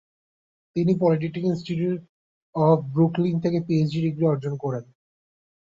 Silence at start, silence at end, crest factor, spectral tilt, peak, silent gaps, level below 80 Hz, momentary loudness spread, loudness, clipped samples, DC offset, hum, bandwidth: 0.75 s; 0.9 s; 16 dB; -9 dB/octave; -8 dBFS; 2.09-2.53 s; -62 dBFS; 10 LU; -24 LUFS; under 0.1%; under 0.1%; none; 7.2 kHz